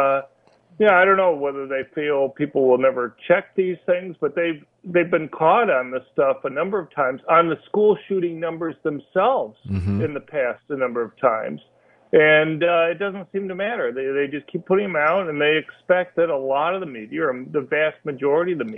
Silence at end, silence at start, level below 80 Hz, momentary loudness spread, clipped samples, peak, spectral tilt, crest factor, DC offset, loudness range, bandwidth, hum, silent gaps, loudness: 0 s; 0 s; -60 dBFS; 10 LU; under 0.1%; -2 dBFS; -8.5 dB/octave; 18 dB; under 0.1%; 3 LU; 3.8 kHz; none; none; -21 LUFS